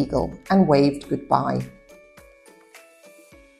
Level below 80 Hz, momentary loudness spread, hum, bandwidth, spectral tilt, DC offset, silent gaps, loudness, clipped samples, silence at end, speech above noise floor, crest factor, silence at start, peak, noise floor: -46 dBFS; 12 LU; none; 12.5 kHz; -7.5 dB/octave; under 0.1%; none; -21 LUFS; under 0.1%; 0.85 s; 31 dB; 20 dB; 0 s; -4 dBFS; -51 dBFS